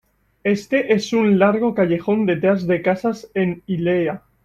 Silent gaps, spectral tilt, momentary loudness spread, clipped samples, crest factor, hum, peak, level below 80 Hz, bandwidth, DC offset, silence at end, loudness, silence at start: none; -7 dB/octave; 7 LU; under 0.1%; 16 dB; none; -4 dBFS; -56 dBFS; 13 kHz; under 0.1%; 0.25 s; -19 LUFS; 0.45 s